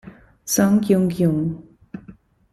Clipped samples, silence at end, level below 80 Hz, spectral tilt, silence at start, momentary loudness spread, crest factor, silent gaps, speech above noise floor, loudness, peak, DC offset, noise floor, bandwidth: under 0.1%; 0.4 s; -52 dBFS; -6 dB/octave; 0.05 s; 22 LU; 16 dB; none; 29 dB; -19 LUFS; -4 dBFS; under 0.1%; -47 dBFS; 14.5 kHz